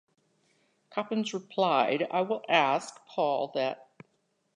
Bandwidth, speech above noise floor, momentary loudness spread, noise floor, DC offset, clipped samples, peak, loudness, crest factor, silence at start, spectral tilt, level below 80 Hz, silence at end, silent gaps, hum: 11 kHz; 46 dB; 11 LU; -74 dBFS; under 0.1%; under 0.1%; -8 dBFS; -29 LUFS; 22 dB; 0.9 s; -4.5 dB/octave; -86 dBFS; 0.8 s; none; none